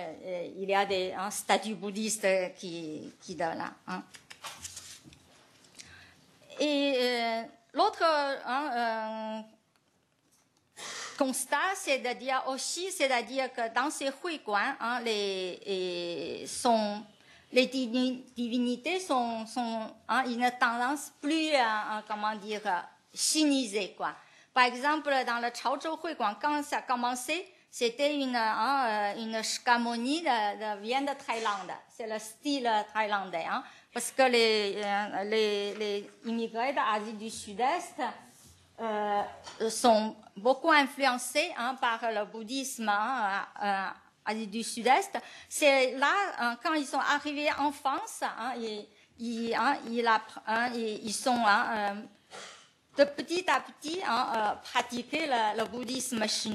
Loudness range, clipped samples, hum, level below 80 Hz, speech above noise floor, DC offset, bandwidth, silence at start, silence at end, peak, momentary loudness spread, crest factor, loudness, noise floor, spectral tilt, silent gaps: 5 LU; under 0.1%; none; -78 dBFS; 41 dB; under 0.1%; 13 kHz; 0 s; 0 s; -8 dBFS; 12 LU; 22 dB; -30 LUFS; -71 dBFS; -2.5 dB/octave; none